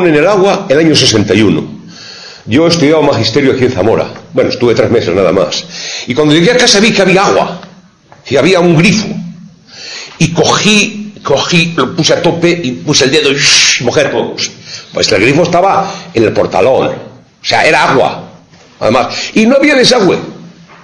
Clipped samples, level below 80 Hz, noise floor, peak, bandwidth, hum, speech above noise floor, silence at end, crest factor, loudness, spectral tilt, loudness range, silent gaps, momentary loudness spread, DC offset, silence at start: 0.8%; -42 dBFS; -40 dBFS; 0 dBFS; 11 kHz; none; 31 dB; 0.35 s; 10 dB; -9 LUFS; -4 dB/octave; 3 LU; none; 14 LU; under 0.1%; 0 s